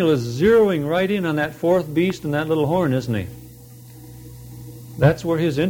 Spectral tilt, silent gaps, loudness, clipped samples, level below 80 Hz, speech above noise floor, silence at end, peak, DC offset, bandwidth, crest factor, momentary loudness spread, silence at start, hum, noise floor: -7 dB/octave; none; -20 LUFS; under 0.1%; -46 dBFS; 23 dB; 0 s; -4 dBFS; under 0.1%; 20 kHz; 16 dB; 23 LU; 0 s; none; -42 dBFS